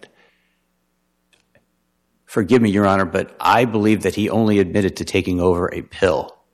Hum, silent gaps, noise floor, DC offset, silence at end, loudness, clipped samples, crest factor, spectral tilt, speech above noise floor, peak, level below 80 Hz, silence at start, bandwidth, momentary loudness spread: none; none; -68 dBFS; under 0.1%; 0.25 s; -18 LUFS; under 0.1%; 16 dB; -6.5 dB/octave; 51 dB; -4 dBFS; -48 dBFS; 2.3 s; 13.5 kHz; 7 LU